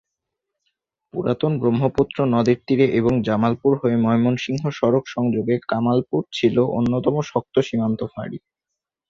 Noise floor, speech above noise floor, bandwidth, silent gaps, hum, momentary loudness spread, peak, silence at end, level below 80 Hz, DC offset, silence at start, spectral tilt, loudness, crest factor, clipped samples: -84 dBFS; 64 dB; 7.4 kHz; none; none; 7 LU; -4 dBFS; 0.7 s; -52 dBFS; under 0.1%; 1.15 s; -7.5 dB/octave; -20 LUFS; 18 dB; under 0.1%